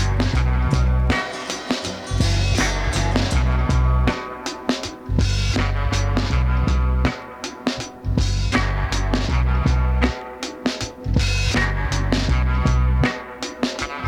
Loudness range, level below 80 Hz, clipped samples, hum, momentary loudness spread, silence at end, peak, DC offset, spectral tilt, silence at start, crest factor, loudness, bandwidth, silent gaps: 1 LU; -22 dBFS; under 0.1%; none; 7 LU; 0 s; -4 dBFS; under 0.1%; -5 dB/octave; 0 s; 16 dB; -21 LUFS; 11.5 kHz; none